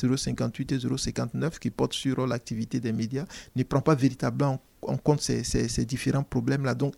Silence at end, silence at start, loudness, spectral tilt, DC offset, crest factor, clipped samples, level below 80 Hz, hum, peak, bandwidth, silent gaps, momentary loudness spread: 0.05 s; 0 s; -28 LUFS; -6 dB/octave; under 0.1%; 18 dB; under 0.1%; -46 dBFS; none; -10 dBFS; 15 kHz; none; 7 LU